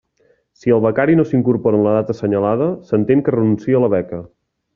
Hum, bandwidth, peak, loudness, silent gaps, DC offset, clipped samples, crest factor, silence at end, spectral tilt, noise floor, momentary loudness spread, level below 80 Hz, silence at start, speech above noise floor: none; 7 kHz; -2 dBFS; -16 LUFS; none; under 0.1%; under 0.1%; 14 dB; 0.5 s; -9 dB/octave; -59 dBFS; 5 LU; -54 dBFS; 0.65 s; 43 dB